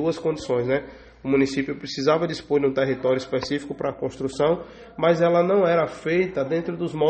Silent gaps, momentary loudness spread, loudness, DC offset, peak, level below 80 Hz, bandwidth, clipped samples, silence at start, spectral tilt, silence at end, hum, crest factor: none; 10 LU; -23 LUFS; under 0.1%; -6 dBFS; -54 dBFS; 8.8 kHz; under 0.1%; 0 s; -6.5 dB/octave; 0 s; none; 16 dB